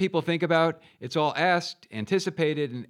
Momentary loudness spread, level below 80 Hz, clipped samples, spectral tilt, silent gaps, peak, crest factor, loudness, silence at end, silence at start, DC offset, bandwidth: 11 LU; -80 dBFS; under 0.1%; -5.5 dB/octave; none; -8 dBFS; 18 dB; -26 LUFS; 0.05 s; 0 s; under 0.1%; 14 kHz